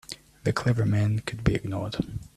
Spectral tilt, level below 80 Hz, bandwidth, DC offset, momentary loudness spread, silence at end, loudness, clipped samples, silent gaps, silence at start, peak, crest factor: -7 dB/octave; -44 dBFS; 13 kHz; under 0.1%; 7 LU; 0.1 s; -27 LUFS; under 0.1%; none; 0.1 s; -8 dBFS; 20 dB